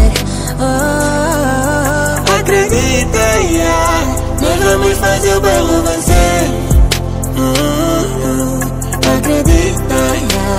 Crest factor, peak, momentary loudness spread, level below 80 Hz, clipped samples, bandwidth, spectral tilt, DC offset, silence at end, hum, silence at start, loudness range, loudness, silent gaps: 12 dB; 0 dBFS; 4 LU; -18 dBFS; under 0.1%; 16.5 kHz; -4.5 dB/octave; 0.2%; 0 s; none; 0 s; 2 LU; -12 LUFS; none